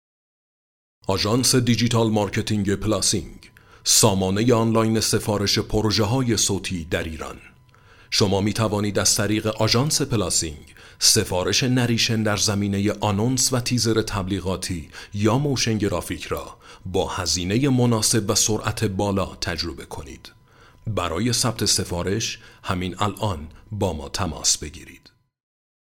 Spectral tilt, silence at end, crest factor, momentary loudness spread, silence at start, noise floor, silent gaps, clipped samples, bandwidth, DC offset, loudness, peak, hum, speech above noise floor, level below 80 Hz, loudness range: -4 dB/octave; 0.9 s; 20 dB; 11 LU; 1.1 s; -51 dBFS; none; under 0.1%; 17 kHz; under 0.1%; -21 LUFS; -2 dBFS; none; 30 dB; -44 dBFS; 5 LU